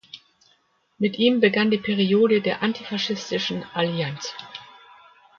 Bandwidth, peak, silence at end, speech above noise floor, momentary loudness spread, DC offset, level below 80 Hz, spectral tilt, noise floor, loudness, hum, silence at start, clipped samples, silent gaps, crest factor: 7.2 kHz; -4 dBFS; 0.75 s; 42 dB; 19 LU; under 0.1%; -66 dBFS; -5.5 dB/octave; -64 dBFS; -22 LUFS; none; 0.15 s; under 0.1%; none; 18 dB